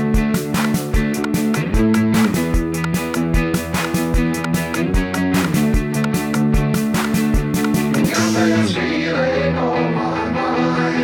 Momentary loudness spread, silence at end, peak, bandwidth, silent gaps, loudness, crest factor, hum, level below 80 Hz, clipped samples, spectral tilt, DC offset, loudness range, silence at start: 4 LU; 0 s; -4 dBFS; over 20 kHz; none; -18 LUFS; 14 dB; none; -26 dBFS; under 0.1%; -5.5 dB/octave; under 0.1%; 1 LU; 0 s